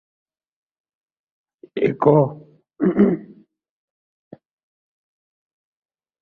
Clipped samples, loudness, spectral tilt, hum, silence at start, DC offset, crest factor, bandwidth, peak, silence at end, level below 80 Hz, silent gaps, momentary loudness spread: under 0.1%; -19 LUFS; -11 dB/octave; none; 1.75 s; under 0.1%; 24 dB; 4.3 kHz; 0 dBFS; 2.95 s; -62 dBFS; none; 11 LU